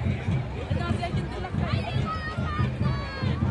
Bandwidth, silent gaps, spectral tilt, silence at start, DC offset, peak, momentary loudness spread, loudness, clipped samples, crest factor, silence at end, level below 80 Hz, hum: 10.5 kHz; none; -7.5 dB/octave; 0 s; under 0.1%; -12 dBFS; 3 LU; -29 LUFS; under 0.1%; 14 dB; 0 s; -38 dBFS; none